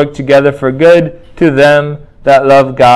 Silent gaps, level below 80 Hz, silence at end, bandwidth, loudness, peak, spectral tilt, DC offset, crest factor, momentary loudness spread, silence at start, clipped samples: none; -40 dBFS; 0 s; 12.5 kHz; -8 LUFS; 0 dBFS; -6.5 dB/octave; under 0.1%; 8 dB; 9 LU; 0 s; 3%